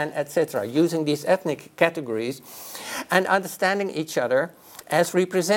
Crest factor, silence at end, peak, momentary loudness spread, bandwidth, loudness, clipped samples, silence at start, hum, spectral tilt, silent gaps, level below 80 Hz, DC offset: 22 dB; 0 s; -2 dBFS; 10 LU; 17 kHz; -24 LUFS; under 0.1%; 0 s; none; -4.5 dB/octave; none; -72 dBFS; under 0.1%